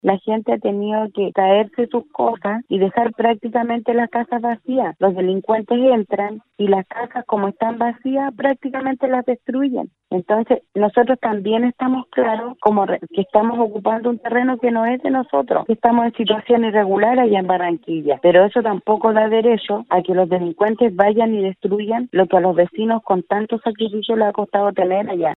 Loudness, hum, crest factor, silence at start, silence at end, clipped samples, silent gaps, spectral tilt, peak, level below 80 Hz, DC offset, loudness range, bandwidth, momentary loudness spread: -18 LUFS; none; 16 dB; 0.05 s; 0 s; under 0.1%; none; -9.5 dB/octave; 0 dBFS; -64 dBFS; under 0.1%; 4 LU; 4.1 kHz; 6 LU